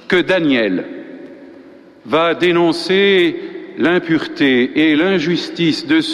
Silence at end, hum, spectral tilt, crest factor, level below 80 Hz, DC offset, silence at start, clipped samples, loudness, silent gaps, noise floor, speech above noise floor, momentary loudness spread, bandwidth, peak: 0 s; none; -5.5 dB/octave; 12 dB; -54 dBFS; under 0.1%; 0.1 s; under 0.1%; -15 LUFS; none; -41 dBFS; 26 dB; 14 LU; 11.5 kHz; -2 dBFS